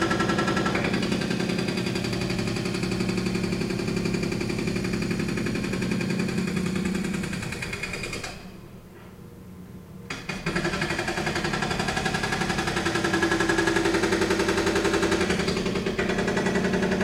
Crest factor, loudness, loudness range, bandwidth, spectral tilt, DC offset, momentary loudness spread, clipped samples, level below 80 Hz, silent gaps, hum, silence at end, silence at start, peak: 18 dB; -26 LUFS; 8 LU; 16 kHz; -5 dB/octave; under 0.1%; 12 LU; under 0.1%; -44 dBFS; none; none; 0 s; 0 s; -8 dBFS